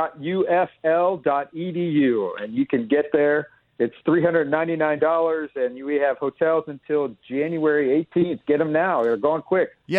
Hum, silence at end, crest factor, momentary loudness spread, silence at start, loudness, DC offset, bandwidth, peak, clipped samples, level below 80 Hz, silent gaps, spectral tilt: none; 0 s; 16 dB; 6 LU; 0 s; -22 LUFS; under 0.1%; 5.6 kHz; -6 dBFS; under 0.1%; -66 dBFS; none; -8.5 dB/octave